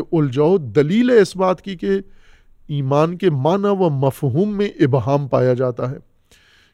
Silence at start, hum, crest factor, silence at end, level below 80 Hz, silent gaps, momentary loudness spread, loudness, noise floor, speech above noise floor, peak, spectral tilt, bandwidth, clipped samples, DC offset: 0 s; none; 16 dB; 0.75 s; -52 dBFS; none; 9 LU; -18 LUFS; -53 dBFS; 36 dB; -2 dBFS; -8 dB/octave; 13.5 kHz; under 0.1%; under 0.1%